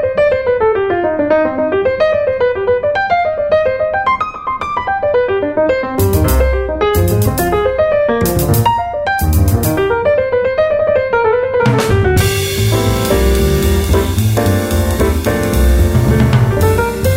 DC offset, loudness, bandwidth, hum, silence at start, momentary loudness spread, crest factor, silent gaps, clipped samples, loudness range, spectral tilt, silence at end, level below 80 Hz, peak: under 0.1%; -13 LUFS; 16.5 kHz; none; 0 s; 3 LU; 12 dB; none; under 0.1%; 2 LU; -6 dB/octave; 0 s; -22 dBFS; 0 dBFS